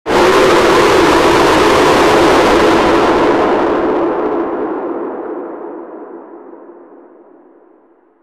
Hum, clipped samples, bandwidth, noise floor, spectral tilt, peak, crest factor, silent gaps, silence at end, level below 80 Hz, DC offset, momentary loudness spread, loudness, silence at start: none; under 0.1%; 15.5 kHz; -49 dBFS; -4.5 dB/octave; -2 dBFS; 10 dB; none; 1.65 s; -36 dBFS; under 0.1%; 17 LU; -10 LUFS; 0.05 s